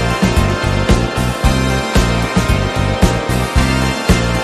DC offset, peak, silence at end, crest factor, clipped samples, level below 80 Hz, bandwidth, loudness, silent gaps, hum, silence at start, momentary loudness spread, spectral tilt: under 0.1%; 0 dBFS; 0 s; 14 dB; under 0.1%; -20 dBFS; 13.5 kHz; -15 LUFS; none; none; 0 s; 2 LU; -5.5 dB/octave